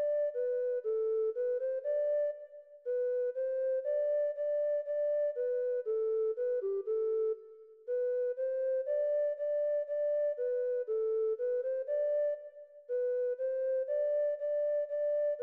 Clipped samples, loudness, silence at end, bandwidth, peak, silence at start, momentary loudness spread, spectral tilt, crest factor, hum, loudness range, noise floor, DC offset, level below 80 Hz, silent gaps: under 0.1%; -33 LUFS; 0 s; 3.1 kHz; -26 dBFS; 0 s; 3 LU; -5 dB/octave; 8 dB; none; 1 LU; -54 dBFS; under 0.1%; under -90 dBFS; none